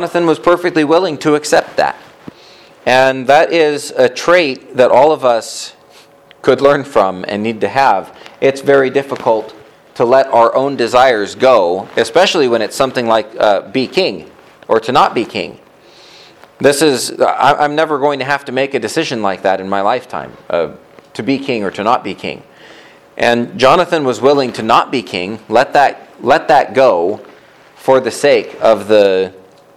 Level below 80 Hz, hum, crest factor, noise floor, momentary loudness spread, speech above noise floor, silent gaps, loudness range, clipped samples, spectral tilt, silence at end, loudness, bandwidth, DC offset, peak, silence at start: -52 dBFS; none; 14 dB; -43 dBFS; 11 LU; 31 dB; none; 5 LU; under 0.1%; -4 dB/octave; 0.4 s; -13 LUFS; 14.5 kHz; under 0.1%; 0 dBFS; 0 s